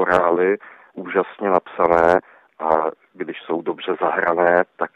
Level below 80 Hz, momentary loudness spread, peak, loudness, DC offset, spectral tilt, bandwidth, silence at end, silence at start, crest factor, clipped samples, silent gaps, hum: -56 dBFS; 14 LU; -2 dBFS; -19 LUFS; under 0.1%; -7 dB/octave; 8.8 kHz; 0.1 s; 0 s; 18 dB; under 0.1%; none; none